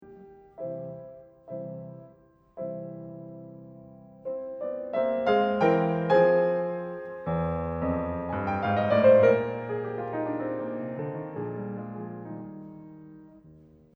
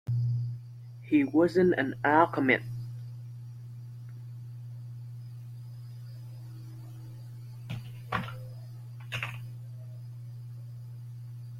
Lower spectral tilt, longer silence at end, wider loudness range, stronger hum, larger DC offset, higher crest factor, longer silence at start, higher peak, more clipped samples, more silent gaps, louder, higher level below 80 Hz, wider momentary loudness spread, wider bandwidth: about the same, -9 dB/octave vs -8 dB/octave; first, 0.4 s vs 0 s; about the same, 15 LU vs 16 LU; neither; neither; about the same, 20 dB vs 24 dB; about the same, 0 s vs 0.05 s; about the same, -8 dBFS vs -8 dBFS; neither; neither; about the same, -27 LUFS vs -29 LUFS; first, -54 dBFS vs -66 dBFS; first, 23 LU vs 20 LU; second, 6 kHz vs 15 kHz